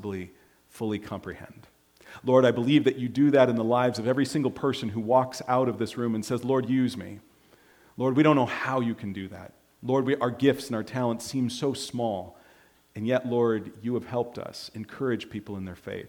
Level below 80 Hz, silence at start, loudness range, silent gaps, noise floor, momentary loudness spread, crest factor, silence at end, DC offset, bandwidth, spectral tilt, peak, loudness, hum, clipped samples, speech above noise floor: -66 dBFS; 0 s; 6 LU; none; -59 dBFS; 16 LU; 20 dB; 0 s; under 0.1%; 18 kHz; -6.5 dB/octave; -6 dBFS; -26 LUFS; none; under 0.1%; 33 dB